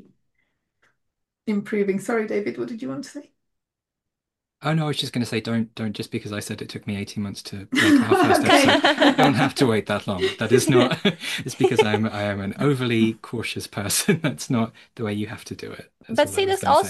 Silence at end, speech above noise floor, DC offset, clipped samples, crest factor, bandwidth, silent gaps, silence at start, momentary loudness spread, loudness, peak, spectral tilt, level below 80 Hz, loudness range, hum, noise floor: 0 s; 64 dB; under 0.1%; under 0.1%; 22 dB; 12.5 kHz; none; 1.45 s; 15 LU; -22 LUFS; 0 dBFS; -4.5 dB/octave; -60 dBFS; 10 LU; none; -85 dBFS